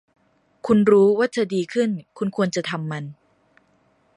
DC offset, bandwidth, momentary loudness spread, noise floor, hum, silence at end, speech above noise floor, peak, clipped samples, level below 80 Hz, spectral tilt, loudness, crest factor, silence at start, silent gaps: under 0.1%; 11 kHz; 15 LU; -62 dBFS; none; 1.05 s; 42 dB; -4 dBFS; under 0.1%; -62 dBFS; -6.5 dB/octave; -21 LUFS; 18 dB; 0.65 s; none